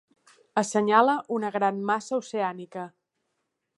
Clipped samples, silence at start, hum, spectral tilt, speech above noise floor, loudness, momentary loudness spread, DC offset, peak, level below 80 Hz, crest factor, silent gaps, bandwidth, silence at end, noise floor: under 0.1%; 0.55 s; none; -4.5 dB/octave; 54 dB; -25 LUFS; 17 LU; under 0.1%; -6 dBFS; -78 dBFS; 22 dB; none; 11.5 kHz; 0.9 s; -79 dBFS